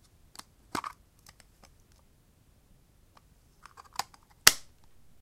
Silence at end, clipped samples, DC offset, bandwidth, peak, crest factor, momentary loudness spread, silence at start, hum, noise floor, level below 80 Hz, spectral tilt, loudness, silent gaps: 0.6 s; under 0.1%; under 0.1%; 16.5 kHz; 0 dBFS; 36 dB; 29 LU; 0.75 s; none; -63 dBFS; -64 dBFS; 0.5 dB/octave; -27 LUFS; none